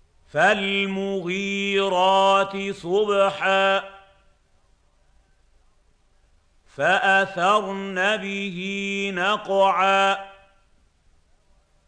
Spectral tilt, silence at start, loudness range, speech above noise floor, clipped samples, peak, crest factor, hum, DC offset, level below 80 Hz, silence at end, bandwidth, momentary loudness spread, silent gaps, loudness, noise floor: -4 dB/octave; 0.35 s; 5 LU; 39 dB; under 0.1%; -6 dBFS; 18 dB; none; under 0.1%; -60 dBFS; 1.55 s; 9.4 kHz; 10 LU; none; -21 LUFS; -60 dBFS